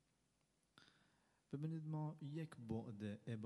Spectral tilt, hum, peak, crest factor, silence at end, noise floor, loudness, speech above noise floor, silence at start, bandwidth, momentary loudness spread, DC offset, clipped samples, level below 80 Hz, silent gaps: -8.5 dB/octave; none; -34 dBFS; 16 dB; 0 s; -83 dBFS; -49 LUFS; 35 dB; 0.75 s; 11.5 kHz; 4 LU; under 0.1%; under 0.1%; -84 dBFS; none